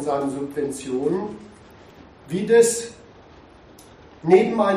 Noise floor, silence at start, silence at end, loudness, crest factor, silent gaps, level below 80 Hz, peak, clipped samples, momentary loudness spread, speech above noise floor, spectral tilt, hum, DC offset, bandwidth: -47 dBFS; 0 s; 0 s; -21 LUFS; 20 dB; none; -58 dBFS; -2 dBFS; under 0.1%; 15 LU; 27 dB; -5 dB/octave; none; under 0.1%; 14 kHz